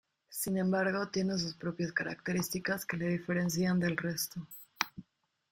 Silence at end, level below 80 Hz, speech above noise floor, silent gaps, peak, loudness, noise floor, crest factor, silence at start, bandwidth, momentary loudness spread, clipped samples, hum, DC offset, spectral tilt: 0.5 s; -68 dBFS; 39 dB; none; -8 dBFS; -34 LUFS; -72 dBFS; 26 dB; 0.3 s; 17 kHz; 7 LU; under 0.1%; none; under 0.1%; -5 dB/octave